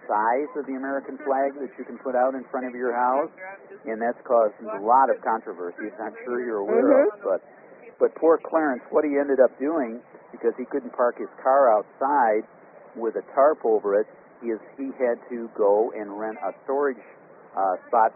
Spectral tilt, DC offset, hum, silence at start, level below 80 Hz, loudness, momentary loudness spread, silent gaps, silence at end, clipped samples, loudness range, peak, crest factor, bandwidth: 1 dB/octave; under 0.1%; none; 0 s; -78 dBFS; -24 LUFS; 14 LU; none; 0.05 s; under 0.1%; 4 LU; -4 dBFS; 20 dB; 2.8 kHz